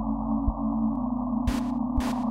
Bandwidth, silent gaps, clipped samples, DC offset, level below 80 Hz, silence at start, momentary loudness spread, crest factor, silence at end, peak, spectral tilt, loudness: 15 kHz; none; under 0.1%; under 0.1%; -34 dBFS; 0 s; 1 LU; 14 dB; 0 s; -12 dBFS; -7.5 dB/octave; -28 LUFS